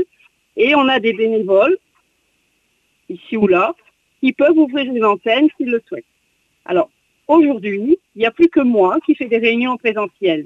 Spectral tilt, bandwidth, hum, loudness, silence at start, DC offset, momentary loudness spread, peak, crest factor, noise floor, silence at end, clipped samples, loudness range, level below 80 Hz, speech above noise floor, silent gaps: -7 dB/octave; 6 kHz; none; -15 LUFS; 0 s; under 0.1%; 12 LU; -2 dBFS; 14 dB; -64 dBFS; 0 s; under 0.1%; 3 LU; -60 dBFS; 49 dB; none